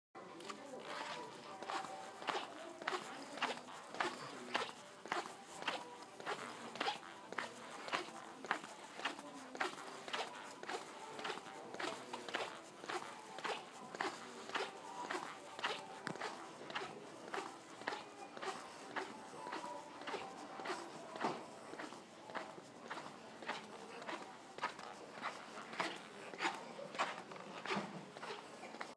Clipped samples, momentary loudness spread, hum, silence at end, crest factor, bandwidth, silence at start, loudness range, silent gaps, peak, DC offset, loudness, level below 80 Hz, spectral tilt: under 0.1%; 9 LU; none; 0 s; 28 dB; 11 kHz; 0.15 s; 4 LU; none; -18 dBFS; under 0.1%; -46 LUFS; under -90 dBFS; -2.5 dB/octave